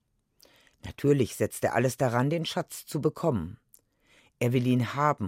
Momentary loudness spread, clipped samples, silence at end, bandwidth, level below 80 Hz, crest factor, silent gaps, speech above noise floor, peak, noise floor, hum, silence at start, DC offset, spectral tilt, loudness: 9 LU; under 0.1%; 0 s; 16.5 kHz; -62 dBFS; 18 dB; none; 37 dB; -12 dBFS; -64 dBFS; none; 0.85 s; under 0.1%; -6 dB/octave; -28 LUFS